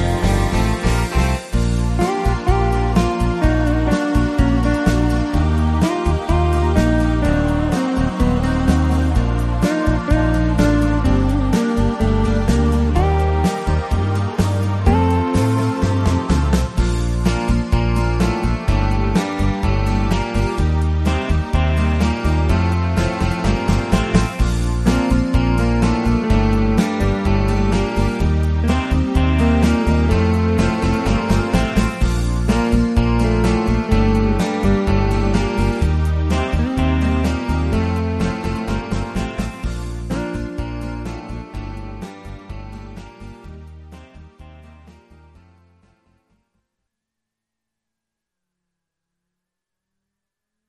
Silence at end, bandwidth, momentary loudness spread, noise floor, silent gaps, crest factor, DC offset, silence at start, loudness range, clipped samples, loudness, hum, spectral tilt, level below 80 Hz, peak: 5.75 s; 13 kHz; 8 LU; -83 dBFS; none; 16 dB; under 0.1%; 0 s; 7 LU; under 0.1%; -18 LUFS; none; -7 dB/octave; -22 dBFS; -2 dBFS